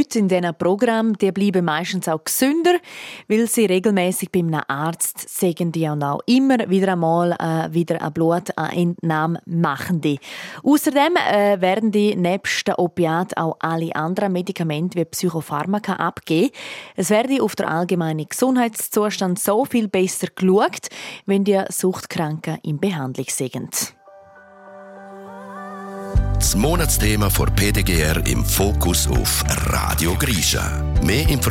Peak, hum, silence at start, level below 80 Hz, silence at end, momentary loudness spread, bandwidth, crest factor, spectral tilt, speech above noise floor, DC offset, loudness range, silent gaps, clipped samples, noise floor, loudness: -4 dBFS; none; 0 s; -30 dBFS; 0 s; 7 LU; 16.5 kHz; 16 dB; -5 dB/octave; 26 dB; under 0.1%; 4 LU; none; under 0.1%; -46 dBFS; -20 LUFS